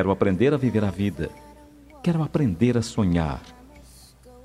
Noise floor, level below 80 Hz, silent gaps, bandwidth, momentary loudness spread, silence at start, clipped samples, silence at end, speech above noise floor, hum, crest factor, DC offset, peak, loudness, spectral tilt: -49 dBFS; -46 dBFS; none; 13.5 kHz; 10 LU; 0 s; under 0.1%; 0.15 s; 26 dB; none; 18 dB; under 0.1%; -6 dBFS; -24 LUFS; -7.5 dB/octave